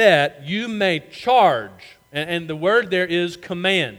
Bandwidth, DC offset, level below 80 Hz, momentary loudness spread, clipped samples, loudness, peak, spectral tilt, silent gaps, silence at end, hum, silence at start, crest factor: 17 kHz; under 0.1%; -62 dBFS; 11 LU; under 0.1%; -20 LUFS; -2 dBFS; -5 dB/octave; none; 0 s; none; 0 s; 18 dB